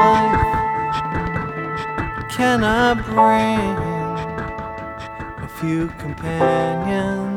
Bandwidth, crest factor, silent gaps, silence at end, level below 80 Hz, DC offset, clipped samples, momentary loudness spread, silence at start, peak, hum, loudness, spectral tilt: 17.5 kHz; 18 dB; none; 0 s; -36 dBFS; under 0.1%; under 0.1%; 14 LU; 0 s; -2 dBFS; none; -20 LUFS; -6 dB/octave